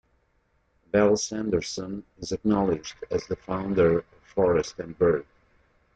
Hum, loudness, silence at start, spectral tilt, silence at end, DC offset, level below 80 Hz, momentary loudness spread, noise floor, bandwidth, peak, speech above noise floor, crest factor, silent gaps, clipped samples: none; -26 LUFS; 0.95 s; -5.5 dB/octave; 0.7 s; under 0.1%; -52 dBFS; 12 LU; -69 dBFS; 9 kHz; -8 dBFS; 44 dB; 18 dB; none; under 0.1%